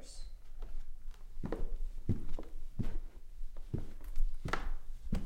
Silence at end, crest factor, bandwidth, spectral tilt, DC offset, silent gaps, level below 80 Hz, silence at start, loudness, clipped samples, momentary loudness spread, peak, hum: 0 s; 16 dB; 8.8 kHz; -6.5 dB/octave; under 0.1%; none; -38 dBFS; 0 s; -45 LUFS; under 0.1%; 14 LU; -18 dBFS; none